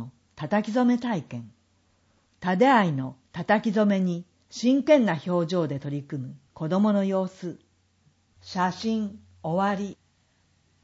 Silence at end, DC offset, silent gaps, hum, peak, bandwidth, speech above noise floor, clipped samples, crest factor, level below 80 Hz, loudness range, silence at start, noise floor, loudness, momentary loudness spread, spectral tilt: 0.9 s; under 0.1%; none; none; -8 dBFS; 8 kHz; 42 dB; under 0.1%; 20 dB; -70 dBFS; 6 LU; 0 s; -66 dBFS; -25 LUFS; 17 LU; -7 dB/octave